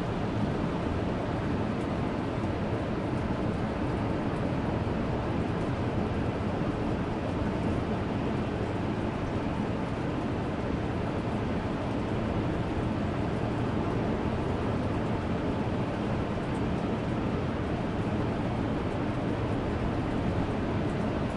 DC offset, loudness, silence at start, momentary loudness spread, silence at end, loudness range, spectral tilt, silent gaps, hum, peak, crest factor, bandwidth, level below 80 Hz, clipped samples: under 0.1%; -31 LUFS; 0 s; 1 LU; 0 s; 1 LU; -8 dB/octave; none; none; -16 dBFS; 14 dB; 11 kHz; -42 dBFS; under 0.1%